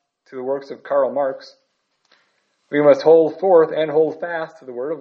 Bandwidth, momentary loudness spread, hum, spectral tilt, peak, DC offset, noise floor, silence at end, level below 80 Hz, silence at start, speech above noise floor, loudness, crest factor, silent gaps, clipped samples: 6.4 kHz; 16 LU; none; -7 dB/octave; -2 dBFS; under 0.1%; -65 dBFS; 0 s; -74 dBFS; 0.3 s; 48 dB; -18 LUFS; 18 dB; none; under 0.1%